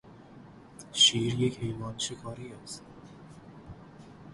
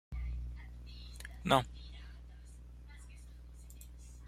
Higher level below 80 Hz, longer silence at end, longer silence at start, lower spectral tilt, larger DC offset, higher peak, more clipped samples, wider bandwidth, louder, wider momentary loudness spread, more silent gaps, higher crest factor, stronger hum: second, -60 dBFS vs -48 dBFS; about the same, 0 s vs 0 s; about the same, 0.05 s vs 0.1 s; second, -3 dB/octave vs -5 dB/octave; neither; about the same, -10 dBFS vs -10 dBFS; neither; second, 11.5 kHz vs 15.5 kHz; first, -27 LUFS vs -37 LUFS; first, 29 LU vs 23 LU; neither; second, 22 dB vs 30 dB; second, none vs 60 Hz at -50 dBFS